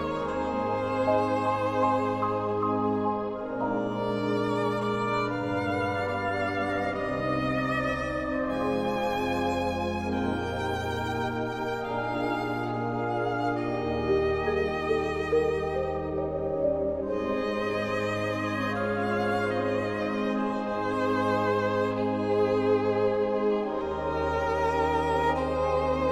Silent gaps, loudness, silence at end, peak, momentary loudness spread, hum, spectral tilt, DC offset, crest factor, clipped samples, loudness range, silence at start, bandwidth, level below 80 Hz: none; -28 LUFS; 0 s; -14 dBFS; 4 LU; none; -6.5 dB/octave; under 0.1%; 14 dB; under 0.1%; 3 LU; 0 s; 14 kHz; -48 dBFS